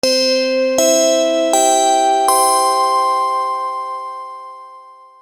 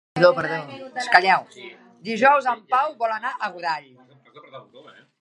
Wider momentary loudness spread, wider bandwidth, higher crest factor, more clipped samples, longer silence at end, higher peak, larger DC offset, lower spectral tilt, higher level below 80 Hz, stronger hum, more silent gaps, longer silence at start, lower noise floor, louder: second, 15 LU vs 18 LU; first, over 20 kHz vs 11 kHz; second, 14 dB vs 22 dB; neither; second, 0.3 s vs 0.6 s; about the same, -2 dBFS vs 0 dBFS; first, 0.2% vs under 0.1%; second, 0 dB/octave vs -4.5 dB/octave; about the same, -64 dBFS vs -68 dBFS; neither; neither; about the same, 0.05 s vs 0.15 s; second, -40 dBFS vs -49 dBFS; first, -14 LUFS vs -21 LUFS